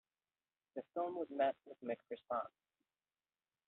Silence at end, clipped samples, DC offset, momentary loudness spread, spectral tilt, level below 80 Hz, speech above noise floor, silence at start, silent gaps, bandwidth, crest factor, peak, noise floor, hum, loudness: 1.2 s; under 0.1%; under 0.1%; 14 LU; -3.5 dB/octave; -90 dBFS; over 48 dB; 0.75 s; none; 4.1 kHz; 20 dB; -26 dBFS; under -90 dBFS; none; -43 LUFS